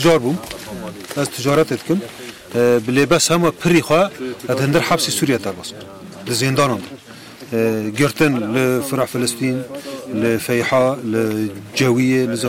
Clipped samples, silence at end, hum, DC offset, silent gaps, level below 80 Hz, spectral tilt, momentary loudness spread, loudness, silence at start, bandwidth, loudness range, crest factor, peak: under 0.1%; 0 s; none; under 0.1%; none; -52 dBFS; -4.5 dB/octave; 15 LU; -18 LUFS; 0 s; 16.5 kHz; 3 LU; 14 dB; -4 dBFS